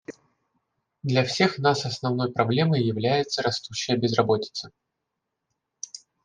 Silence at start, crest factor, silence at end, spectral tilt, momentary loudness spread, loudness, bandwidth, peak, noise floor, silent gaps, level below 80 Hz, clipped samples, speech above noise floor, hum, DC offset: 0.1 s; 22 dB; 0.3 s; -5 dB/octave; 17 LU; -24 LUFS; 9.8 kHz; -4 dBFS; -82 dBFS; none; -66 dBFS; under 0.1%; 58 dB; none; under 0.1%